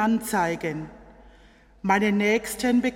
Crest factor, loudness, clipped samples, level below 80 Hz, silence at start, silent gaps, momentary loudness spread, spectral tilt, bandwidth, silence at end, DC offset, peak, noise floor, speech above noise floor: 18 dB; -24 LUFS; under 0.1%; -54 dBFS; 0 s; none; 12 LU; -5 dB/octave; 16.5 kHz; 0 s; under 0.1%; -6 dBFS; -53 dBFS; 30 dB